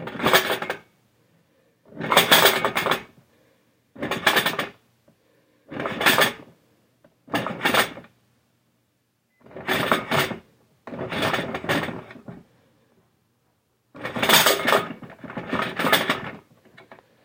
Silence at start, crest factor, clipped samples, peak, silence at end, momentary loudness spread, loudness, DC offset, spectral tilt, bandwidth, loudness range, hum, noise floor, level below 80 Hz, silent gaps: 0 s; 24 dB; under 0.1%; 0 dBFS; 0.3 s; 21 LU; -21 LUFS; under 0.1%; -2.5 dB/octave; 17 kHz; 8 LU; none; -70 dBFS; -62 dBFS; none